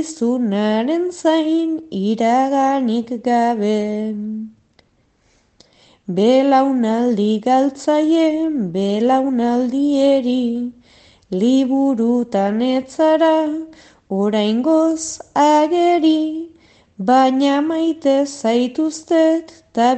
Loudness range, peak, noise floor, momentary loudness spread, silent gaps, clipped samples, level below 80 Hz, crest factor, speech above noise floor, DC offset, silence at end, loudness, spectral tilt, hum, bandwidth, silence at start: 3 LU; -4 dBFS; -59 dBFS; 10 LU; none; under 0.1%; -62 dBFS; 14 dB; 43 dB; under 0.1%; 0 s; -17 LUFS; -5.5 dB/octave; none; 9 kHz; 0 s